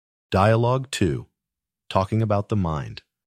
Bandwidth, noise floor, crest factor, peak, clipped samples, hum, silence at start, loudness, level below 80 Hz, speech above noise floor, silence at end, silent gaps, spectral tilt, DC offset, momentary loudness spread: 13 kHz; -87 dBFS; 18 dB; -4 dBFS; under 0.1%; none; 0.3 s; -23 LUFS; -46 dBFS; 66 dB; 0.3 s; none; -6.5 dB/octave; under 0.1%; 11 LU